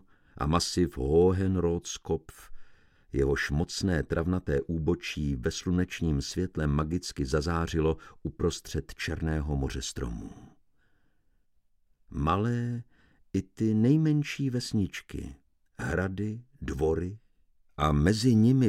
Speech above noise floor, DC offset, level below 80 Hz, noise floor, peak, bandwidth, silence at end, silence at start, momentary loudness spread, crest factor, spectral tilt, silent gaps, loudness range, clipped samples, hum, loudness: 39 dB; under 0.1%; -42 dBFS; -67 dBFS; -10 dBFS; 15 kHz; 0 s; 0.35 s; 13 LU; 20 dB; -6 dB/octave; none; 6 LU; under 0.1%; none; -29 LUFS